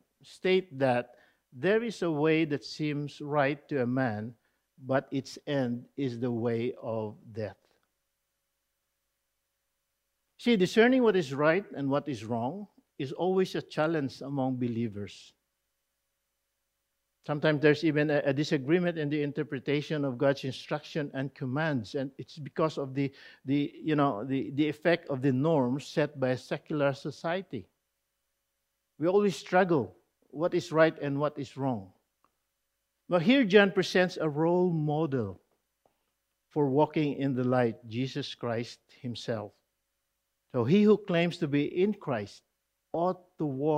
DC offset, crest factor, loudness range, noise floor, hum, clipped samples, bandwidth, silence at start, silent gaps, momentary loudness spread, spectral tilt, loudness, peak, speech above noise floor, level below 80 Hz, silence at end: under 0.1%; 24 dB; 7 LU; -82 dBFS; none; under 0.1%; 13 kHz; 0.25 s; none; 12 LU; -7 dB/octave; -29 LUFS; -6 dBFS; 53 dB; -74 dBFS; 0 s